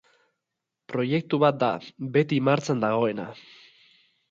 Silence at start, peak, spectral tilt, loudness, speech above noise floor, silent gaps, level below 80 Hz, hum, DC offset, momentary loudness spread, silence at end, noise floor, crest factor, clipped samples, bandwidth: 0.9 s; -8 dBFS; -7 dB/octave; -25 LUFS; 60 dB; none; -70 dBFS; none; under 0.1%; 12 LU; 0.9 s; -84 dBFS; 18 dB; under 0.1%; 7.8 kHz